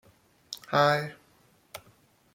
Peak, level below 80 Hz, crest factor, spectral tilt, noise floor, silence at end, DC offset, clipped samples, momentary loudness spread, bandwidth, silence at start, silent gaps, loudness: -10 dBFS; -70 dBFS; 22 dB; -5 dB/octave; -63 dBFS; 0.6 s; under 0.1%; under 0.1%; 23 LU; 16.5 kHz; 0.5 s; none; -26 LUFS